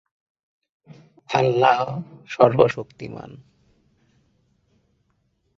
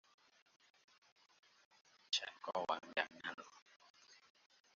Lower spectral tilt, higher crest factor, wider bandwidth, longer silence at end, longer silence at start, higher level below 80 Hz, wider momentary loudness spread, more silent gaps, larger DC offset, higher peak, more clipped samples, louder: first, -6.5 dB/octave vs 1.5 dB/octave; second, 22 dB vs 28 dB; about the same, 7.4 kHz vs 7.4 kHz; first, 2.2 s vs 0.6 s; second, 1.3 s vs 2.1 s; first, -62 dBFS vs under -90 dBFS; second, 20 LU vs 24 LU; second, none vs 3.34-3.38 s, 3.62-3.66 s, 3.76-3.80 s, 3.90-3.94 s; neither; first, -2 dBFS vs -22 dBFS; neither; first, -20 LUFS vs -42 LUFS